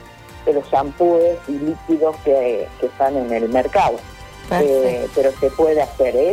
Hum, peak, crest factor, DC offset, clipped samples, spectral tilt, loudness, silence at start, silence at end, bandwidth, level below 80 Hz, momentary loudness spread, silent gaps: none; -6 dBFS; 12 dB; under 0.1%; under 0.1%; -6.5 dB/octave; -18 LUFS; 0 s; 0 s; 15.5 kHz; -42 dBFS; 8 LU; none